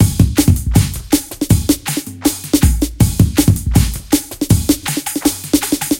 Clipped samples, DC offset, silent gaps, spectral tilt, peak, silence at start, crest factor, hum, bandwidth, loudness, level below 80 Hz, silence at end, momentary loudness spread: under 0.1%; under 0.1%; none; -5 dB/octave; 0 dBFS; 0 s; 14 dB; none; 17.5 kHz; -15 LUFS; -22 dBFS; 0 s; 5 LU